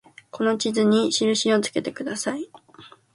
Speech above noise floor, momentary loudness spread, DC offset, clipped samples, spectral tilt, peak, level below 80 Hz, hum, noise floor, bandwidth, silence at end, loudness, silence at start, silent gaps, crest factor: 27 dB; 12 LU; under 0.1%; under 0.1%; -3.5 dB/octave; -8 dBFS; -68 dBFS; none; -49 dBFS; 11.5 kHz; 0.3 s; -22 LUFS; 0.35 s; none; 16 dB